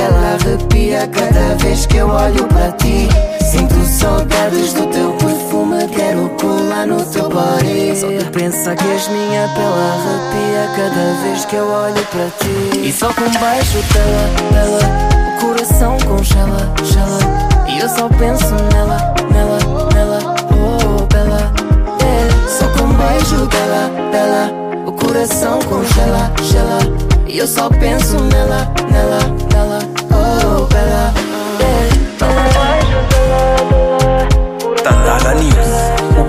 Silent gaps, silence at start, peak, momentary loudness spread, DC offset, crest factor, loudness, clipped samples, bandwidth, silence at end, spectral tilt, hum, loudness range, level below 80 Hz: none; 0 s; 0 dBFS; 4 LU; under 0.1%; 12 dB; -13 LUFS; under 0.1%; 16 kHz; 0 s; -5.5 dB/octave; none; 3 LU; -16 dBFS